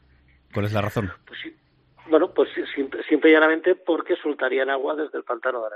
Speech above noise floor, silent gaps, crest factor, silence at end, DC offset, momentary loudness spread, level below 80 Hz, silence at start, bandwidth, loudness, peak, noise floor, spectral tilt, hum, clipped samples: 35 dB; none; 20 dB; 0 s; under 0.1%; 17 LU; -60 dBFS; 0.55 s; 14 kHz; -22 LUFS; -4 dBFS; -57 dBFS; -7 dB/octave; none; under 0.1%